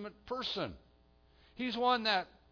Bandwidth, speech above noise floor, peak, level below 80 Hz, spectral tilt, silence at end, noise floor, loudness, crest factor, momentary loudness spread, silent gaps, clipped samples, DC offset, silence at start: 5.4 kHz; 31 dB; -16 dBFS; -64 dBFS; -1 dB/octave; 0.25 s; -66 dBFS; -34 LUFS; 20 dB; 11 LU; none; under 0.1%; under 0.1%; 0 s